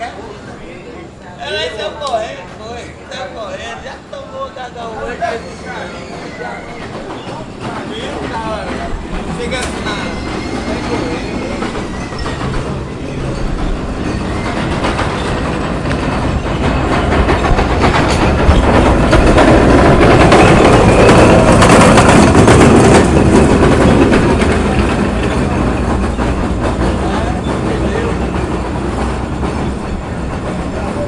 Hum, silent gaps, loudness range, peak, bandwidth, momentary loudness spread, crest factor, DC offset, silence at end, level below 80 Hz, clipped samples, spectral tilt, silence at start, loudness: none; none; 17 LU; 0 dBFS; 11.5 kHz; 19 LU; 12 dB; under 0.1%; 0 s; -22 dBFS; 0.2%; -6 dB/octave; 0 s; -12 LUFS